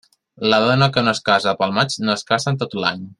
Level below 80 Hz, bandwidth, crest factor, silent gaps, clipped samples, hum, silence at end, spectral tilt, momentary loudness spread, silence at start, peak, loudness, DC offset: -58 dBFS; 11.5 kHz; 18 dB; none; under 0.1%; none; 0.05 s; -5 dB/octave; 6 LU; 0.4 s; -2 dBFS; -18 LUFS; under 0.1%